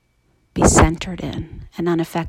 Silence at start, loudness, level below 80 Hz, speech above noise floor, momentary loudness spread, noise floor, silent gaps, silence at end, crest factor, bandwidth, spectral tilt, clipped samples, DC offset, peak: 0.55 s; -18 LUFS; -28 dBFS; 43 dB; 18 LU; -62 dBFS; none; 0 s; 20 dB; 16.5 kHz; -5 dB/octave; under 0.1%; under 0.1%; 0 dBFS